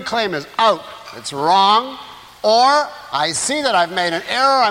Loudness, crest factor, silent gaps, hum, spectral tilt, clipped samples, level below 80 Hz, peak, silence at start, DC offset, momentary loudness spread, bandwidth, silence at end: -16 LUFS; 14 dB; none; none; -2 dB/octave; under 0.1%; -60 dBFS; -2 dBFS; 0 s; under 0.1%; 16 LU; 16.5 kHz; 0 s